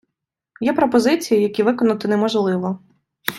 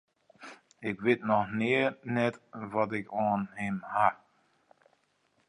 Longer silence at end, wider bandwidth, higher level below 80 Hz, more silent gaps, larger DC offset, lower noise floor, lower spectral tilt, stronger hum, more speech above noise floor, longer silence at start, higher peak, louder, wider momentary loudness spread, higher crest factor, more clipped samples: second, 0 s vs 1.35 s; first, 16.5 kHz vs 10.5 kHz; first, -62 dBFS vs -70 dBFS; neither; neither; first, -81 dBFS vs -72 dBFS; second, -5.5 dB/octave vs -7 dB/octave; neither; first, 64 dB vs 42 dB; first, 0.6 s vs 0.4 s; first, 0 dBFS vs -10 dBFS; first, -19 LUFS vs -30 LUFS; second, 9 LU vs 22 LU; about the same, 18 dB vs 22 dB; neither